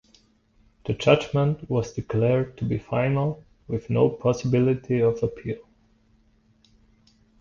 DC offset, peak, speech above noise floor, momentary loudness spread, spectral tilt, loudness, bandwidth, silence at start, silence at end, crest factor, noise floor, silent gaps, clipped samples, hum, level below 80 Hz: under 0.1%; -4 dBFS; 38 dB; 12 LU; -7.5 dB/octave; -24 LUFS; 7.2 kHz; 0.85 s; 1.85 s; 22 dB; -61 dBFS; none; under 0.1%; none; -50 dBFS